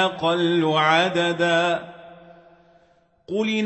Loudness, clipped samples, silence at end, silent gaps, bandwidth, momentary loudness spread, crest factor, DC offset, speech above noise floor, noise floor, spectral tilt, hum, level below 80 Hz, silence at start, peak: -20 LUFS; under 0.1%; 0 s; none; 8.4 kHz; 11 LU; 18 dB; under 0.1%; 39 dB; -60 dBFS; -5 dB/octave; none; -68 dBFS; 0 s; -4 dBFS